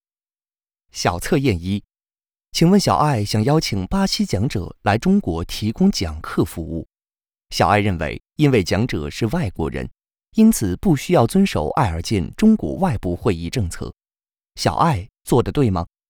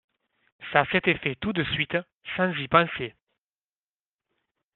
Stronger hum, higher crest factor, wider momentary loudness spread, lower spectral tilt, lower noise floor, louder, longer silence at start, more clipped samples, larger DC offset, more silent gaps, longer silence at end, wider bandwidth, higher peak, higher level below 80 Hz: neither; second, 16 dB vs 26 dB; about the same, 11 LU vs 13 LU; first, -6 dB/octave vs -3 dB/octave; about the same, under -90 dBFS vs under -90 dBFS; first, -19 LUFS vs -25 LUFS; first, 0.95 s vs 0.6 s; neither; neither; second, none vs 2.16-2.21 s; second, 0.25 s vs 1.65 s; first, 19.5 kHz vs 4.3 kHz; about the same, -2 dBFS vs -2 dBFS; first, -38 dBFS vs -58 dBFS